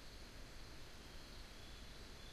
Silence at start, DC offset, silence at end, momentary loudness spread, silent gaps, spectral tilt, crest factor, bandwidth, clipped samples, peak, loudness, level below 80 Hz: 0 s; under 0.1%; 0 s; 1 LU; none; -3.5 dB/octave; 14 dB; 15.5 kHz; under 0.1%; -40 dBFS; -56 LUFS; -58 dBFS